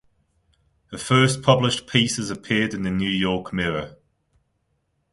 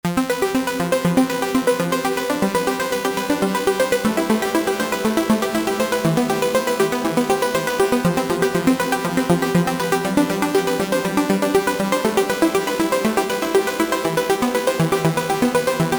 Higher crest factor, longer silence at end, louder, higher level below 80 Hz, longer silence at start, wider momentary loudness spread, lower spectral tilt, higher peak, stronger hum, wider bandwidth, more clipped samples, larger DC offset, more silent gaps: first, 22 dB vs 16 dB; first, 1.2 s vs 0 s; about the same, -21 LUFS vs -19 LUFS; about the same, -50 dBFS vs -50 dBFS; first, 0.9 s vs 0.05 s; first, 12 LU vs 2 LU; about the same, -4.5 dB/octave vs -5 dB/octave; about the same, -2 dBFS vs -4 dBFS; neither; second, 11.5 kHz vs over 20 kHz; neither; neither; neither